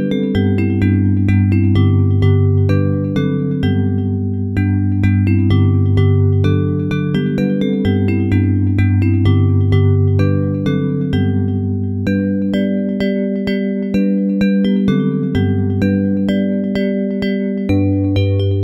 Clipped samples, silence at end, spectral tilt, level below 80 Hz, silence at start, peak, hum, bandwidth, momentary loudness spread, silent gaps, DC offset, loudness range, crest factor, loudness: under 0.1%; 0 s; -9.5 dB/octave; -38 dBFS; 0 s; -2 dBFS; none; 5.6 kHz; 5 LU; none; under 0.1%; 2 LU; 12 dB; -15 LUFS